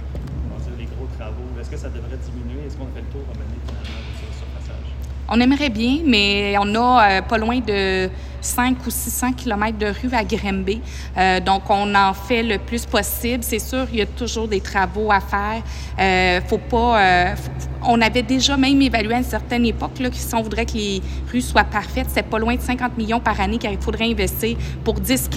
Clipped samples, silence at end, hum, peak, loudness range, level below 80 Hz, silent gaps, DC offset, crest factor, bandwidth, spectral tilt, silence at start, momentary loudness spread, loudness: under 0.1%; 0 s; none; 0 dBFS; 13 LU; -30 dBFS; none; under 0.1%; 18 dB; 16 kHz; -4.5 dB/octave; 0 s; 15 LU; -19 LUFS